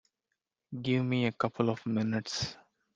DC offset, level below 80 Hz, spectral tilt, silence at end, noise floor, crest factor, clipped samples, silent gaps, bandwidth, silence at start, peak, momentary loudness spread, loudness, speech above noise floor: under 0.1%; -66 dBFS; -6 dB/octave; 0.4 s; -86 dBFS; 20 dB; under 0.1%; none; 9.4 kHz; 0.7 s; -12 dBFS; 9 LU; -32 LUFS; 55 dB